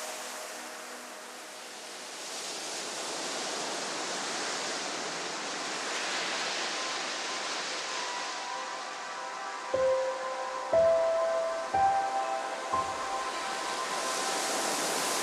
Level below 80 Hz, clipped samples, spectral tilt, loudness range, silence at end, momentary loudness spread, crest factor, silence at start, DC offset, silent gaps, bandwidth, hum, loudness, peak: -70 dBFS; under 0.1%; -1 dB/octave; 6 LU; 0 s; 12 LU; 18 dB; 0 s; under 0.1%; none; 15 kHz; none; -32 LUFS; -16 dBFS